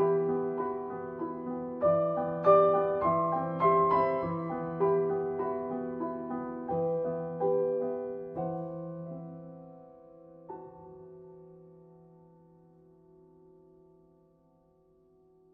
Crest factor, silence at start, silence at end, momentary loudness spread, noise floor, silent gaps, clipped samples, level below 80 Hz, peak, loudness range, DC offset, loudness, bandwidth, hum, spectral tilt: 20 dB; 0 s; 3.8 s; 22 LU; -65 dBFS; none; under 0.1%; -68 dBFS; -12 dBFS; 23 LU; under 0.1%; -30 LUFS; 5 kHz; none; -11 dB/octave